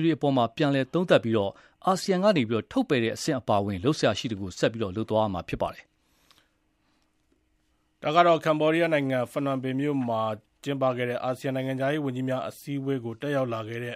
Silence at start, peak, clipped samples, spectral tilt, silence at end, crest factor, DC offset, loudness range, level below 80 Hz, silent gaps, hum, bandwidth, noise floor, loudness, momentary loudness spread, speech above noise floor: 0 s; -4 dBFS; under 0.1%; -6 dB/octave; 0 s; 22 dB; under 0.1%; 6 LU; -60 dBFS; none; none; 15 kHz; -70 dBFS; -26 LUFS; 9 LU; 44 dB